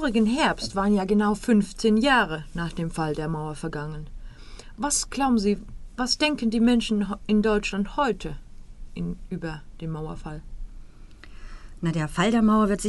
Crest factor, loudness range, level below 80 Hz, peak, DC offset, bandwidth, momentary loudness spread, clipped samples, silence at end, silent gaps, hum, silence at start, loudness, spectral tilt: 16 dB; 11 LU; -40 dBFS; -8 dBFS; under 0.1%; 11.5 kHz; 16 LU; under 0.1%; 0 s; none; none; 0 s; -24 LUFS; -4.5 dB/octave